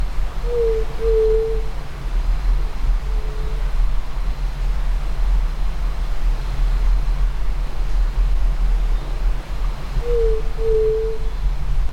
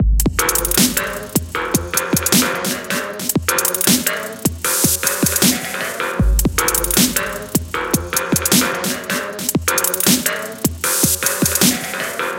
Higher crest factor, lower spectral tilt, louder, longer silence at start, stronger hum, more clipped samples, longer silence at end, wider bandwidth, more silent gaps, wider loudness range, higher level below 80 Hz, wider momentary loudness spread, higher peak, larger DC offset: about the same, 12 dB vs 16 dB; first, -6.5 dB/octave vs -2.5 dB/octave; second, -24 LUFS vs -16 LUFS; about the same, 0 s vs 0 s; neither; neither; about the same, 0 s vs 0 s; second, 7.2 kHz vs 17.5 kHz; neither; about the same, 3 LU vs 1 LU; first, -20 dBFS vs -28 dBFS; about the same, 8 LU vs 7 LU; second, -6 dBFS vs 0 dBFS; neither